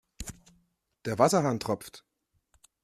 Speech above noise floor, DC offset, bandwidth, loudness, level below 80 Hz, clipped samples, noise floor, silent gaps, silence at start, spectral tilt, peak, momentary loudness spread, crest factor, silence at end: 44 dB; under 0.1%; 15 kHz; -27 LUFS; -56 dBFS; under 0.1%; -71 dBFS; none; 0.2 s; -5 dB/octave; -6 dBFS; 19 LU; 24 dB; 0.85 s